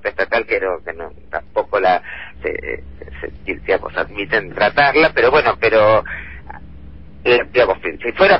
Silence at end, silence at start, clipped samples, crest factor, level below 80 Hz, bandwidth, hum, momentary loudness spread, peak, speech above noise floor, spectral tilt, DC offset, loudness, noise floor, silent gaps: 0 s; 0.05 s; under 0.1%; 16 dB; -40 dBFS; 5.8 kHz; none; 19 LU; -2 dBFS; 21 dB; -7.5 dB/octave; 1%; -16 LUFS; -38 dBFS; none